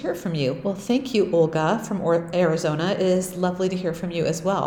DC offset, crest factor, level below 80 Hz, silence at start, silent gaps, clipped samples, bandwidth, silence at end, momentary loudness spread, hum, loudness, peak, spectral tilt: under 0.1%; 14 dB; -56 dBFS; 0 s; none; under 0.1%; 17.5 kHz; 0 s; 5 LU; none; -23 LUFS; -8 dBFS; -6 dB/octave